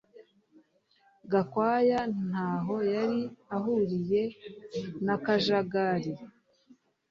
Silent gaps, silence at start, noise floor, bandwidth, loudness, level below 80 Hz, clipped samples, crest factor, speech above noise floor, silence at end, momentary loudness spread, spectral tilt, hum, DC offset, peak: none; 0.15 s; -67 dBFS; 7.4 kHz; -30 LUFS; -68 dBFS; under 0.1%; 18 dB; 38 dB; 0.8 s; 12 LU; -7 dB/octave; none; under 0.1%; -12 dBFS